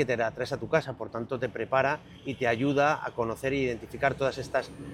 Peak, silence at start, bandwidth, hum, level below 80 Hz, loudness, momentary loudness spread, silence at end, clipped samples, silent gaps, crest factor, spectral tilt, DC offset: -10 dBFS; 0 s; 16 kHz; none; -56 dBFS; -29 LUFS; 9 LU; 0 s; under 0.1%; none; 20 dB; -6 dB/octave; under 0.1%